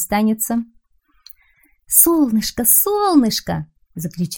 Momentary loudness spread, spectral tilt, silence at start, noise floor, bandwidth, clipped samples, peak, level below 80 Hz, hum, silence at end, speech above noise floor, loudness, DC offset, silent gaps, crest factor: 17 LU; -3.5 dB/octave; 0 s; -58 dBFS; over 20 kHz; under 0.1%; 0 dBFS; -46 dBFS; none; 0 s; 42 dB; -15 LUFS; under 0.1%; none; 18 dB